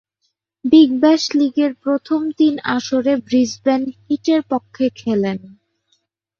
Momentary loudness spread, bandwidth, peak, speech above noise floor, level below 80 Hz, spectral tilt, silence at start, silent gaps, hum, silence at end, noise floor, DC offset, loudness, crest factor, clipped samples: 10 LU; 7.4 kHz; -2 dBFS; 55 dB; -62 dBFS; -5 dB/octave; 0.65 s; none; none; 0.9 s; -71 dBFS; under 0.1%; -17 LUFS; 16 dB; under 0.1%